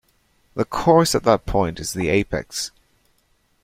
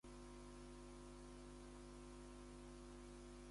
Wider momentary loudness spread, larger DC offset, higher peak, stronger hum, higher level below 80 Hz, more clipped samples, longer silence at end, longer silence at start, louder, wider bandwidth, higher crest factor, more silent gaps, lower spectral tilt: first, 12 LU vs 0 LU; neither; first, 0 dBFS vs -46 dBFS; second, none vs 50 Hz at -60 dBFS; first, -40 dBFS vs -62 dBFS; neither; first, 0.95 s vs 0 s; first, 0.55 s vs 0.05 s; first, -20 LUFS vs -59 LUFS; first, 16.5 kHz vs 11.5 kHz; first, 20 dB vs 10 dB; neither; about the same, -5 dB/octave vs -5 dB/octave